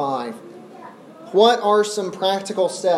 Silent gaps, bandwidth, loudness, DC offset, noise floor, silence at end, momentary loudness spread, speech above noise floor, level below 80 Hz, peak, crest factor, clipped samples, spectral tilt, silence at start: none; 14 kHz; -19 LUFS; under 0.1%; -41 dBFS; 0 s; 25 LU; 23 dB; -76 dBFS; -2 dBFS; 18 dB; under 0.1%; -3.5 dB/octave; 0 s